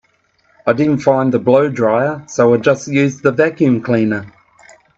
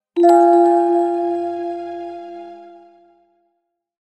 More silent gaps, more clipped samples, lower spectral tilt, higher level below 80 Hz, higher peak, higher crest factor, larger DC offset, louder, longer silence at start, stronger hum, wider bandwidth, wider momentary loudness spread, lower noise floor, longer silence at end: neither; neither; first, -7 dB/octave vs -5.5 dB/octave; first, -58 dBFS vs -72 dBFS; about the same, 0 dBFS vs -2 dBFS; about the same, 14 dB vs 16 dB; neither; about the same, -14 LUFS vs -15 LUFS; first, 0.65 s vs 0.15 s; neither; about the same, 8 kHz vs 8.2 kHz; second, 6 LU vs 22 LU; second, -58 dBFS vs -73 dBFS; second, 0.7 s vs 1.3 s